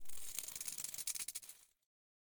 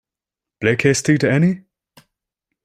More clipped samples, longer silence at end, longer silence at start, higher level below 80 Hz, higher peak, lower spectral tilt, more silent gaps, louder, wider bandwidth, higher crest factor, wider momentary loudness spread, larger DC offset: neither; second, 0.4 s vs 1.05 s; second, 0 s vs 0.6 s; second, -74 dBFS vs -54 dBFS; second, -24 dBFS vs -2 dBFS; second, 1.5 dB/octave vs -5.5 dB/octave; neither; second, -43 LUFS vs -17 LUFS; first, over 20 kHz vs 14 kHz; about the same, 22 dB vs 18 dB; first, 12 LU vs 6 LU; neither